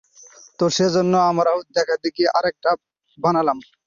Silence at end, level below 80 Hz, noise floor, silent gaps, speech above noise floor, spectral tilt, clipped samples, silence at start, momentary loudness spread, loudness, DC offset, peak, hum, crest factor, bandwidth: 0.25 s; -62 dBFS; -47 dBFS; none; 28 dB; -5 dB/octave; under 0.1%; 0.6 s; 6 LU; -20 LUFS; under 0.1%; -4 dBFS; none; 16 dB; 7.4 kHz